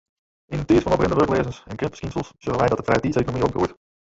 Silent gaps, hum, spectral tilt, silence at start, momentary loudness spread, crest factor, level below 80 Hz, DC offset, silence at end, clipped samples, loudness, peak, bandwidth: none; none; -7 dB/octave; 0.5 s; 11 LU; 18 dB; -42 dBFS; under 0.1%; 0.45 s; under 0.1%; -22 LUFS; -6 dBFS; 8 kHz